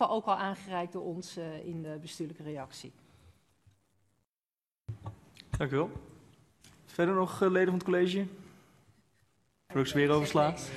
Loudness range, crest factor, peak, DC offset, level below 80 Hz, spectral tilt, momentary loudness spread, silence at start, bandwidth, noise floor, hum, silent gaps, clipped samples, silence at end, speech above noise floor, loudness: 15 LU; 20 dB; -12 dBFS; under 0.1%; -58 dBFS; -6 dB/octave; 19 LU; 0 s; 13.5 kHz; under -90 dBFS; none; 4.29-4.42 s; under 0.1%; 0 s; over 59 dB; -32 LUFS